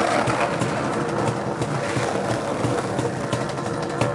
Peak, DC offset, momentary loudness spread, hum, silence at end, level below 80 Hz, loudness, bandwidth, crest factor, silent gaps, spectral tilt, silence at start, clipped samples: -8 dBFS; under 0.1%; 4 LU; none; 0 s; -52 dBFS; -24 LUFS; 11.5 kHz; 16 dB; none; -5.5 dB/octave; 0 s; under 0.1%